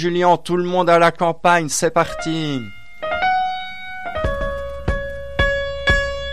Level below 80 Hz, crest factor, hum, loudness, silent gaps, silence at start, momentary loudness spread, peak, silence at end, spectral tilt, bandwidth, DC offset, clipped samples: -32 dBFS; 16 dB; none; -19 LUFS; none; 0 s; 12 LU; -2 dBFS; 0 s; -4.5 dB/octave; 14.5 kHz; 2%; under 0.1%